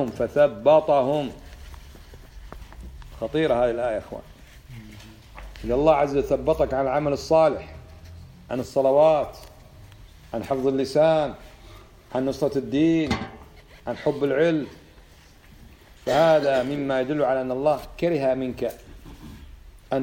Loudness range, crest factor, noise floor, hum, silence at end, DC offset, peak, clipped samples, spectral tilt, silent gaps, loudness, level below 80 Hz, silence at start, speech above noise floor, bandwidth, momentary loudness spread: 5 LU; 18 dB; -50 dBFS; none; 0 s; under 0.1%; -6 dBFS; under 0.1%; -6.5 dB/octave; none; -23 LUFS; -46 dBFS; 0 s; 28 dB; 16.5 kHz; 25 LU